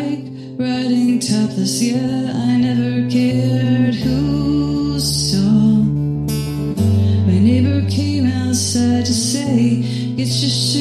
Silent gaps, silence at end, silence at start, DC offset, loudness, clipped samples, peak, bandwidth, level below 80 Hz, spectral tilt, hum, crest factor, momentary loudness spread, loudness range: none; 0 s; 0 s; under 0.1%; -16 LUFS; under 0.1%; -4 dBFS; 14 kHz; -34 dBFS; -5.5 dB/octave; none; 12 dB; 6 LU; 1 LU